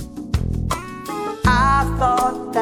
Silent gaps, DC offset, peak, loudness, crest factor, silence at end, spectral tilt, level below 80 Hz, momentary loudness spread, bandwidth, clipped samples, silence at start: none; under 0.1%; -2 dBFS; -20 LUFS; 18 dB; 0 s; -5.5 dB/octave; -28 dBFS; 11 LU; 17.5 kHz; under 0.1%; 0 s